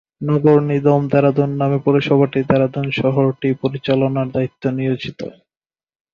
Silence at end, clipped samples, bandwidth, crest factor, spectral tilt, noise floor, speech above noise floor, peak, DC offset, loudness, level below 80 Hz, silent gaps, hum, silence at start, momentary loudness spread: 0.8 s; under 0.1%; 6.8 kHz; 16 dB; -9 dB/octave; under -90 dBFS; over 74 dB; -2 dBFS; under 0.1%; -17 LUFS; -52 dBFS; none; none; 0.2 s; 7 LU